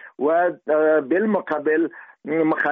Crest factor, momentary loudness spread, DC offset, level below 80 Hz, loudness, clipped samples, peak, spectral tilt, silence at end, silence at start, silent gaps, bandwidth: 12 dB; 7 LU; under 0.1%; -70 dBFS; -21 LUFS; under 0.1%; -8 dBFS; -5.5 dB/octave; 0 s; 0.05 s; none; 4.2 kHz